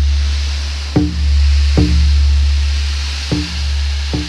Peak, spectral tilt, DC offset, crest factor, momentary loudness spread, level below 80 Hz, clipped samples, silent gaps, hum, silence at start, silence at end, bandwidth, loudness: 0 dBFS; -5.5 dB/octave; under 0.1%; 14 dB; 6 LU; -14 dBFS; under 0.1%; none; none; 0 s; 0 s; 10 kHz; -15 LUFS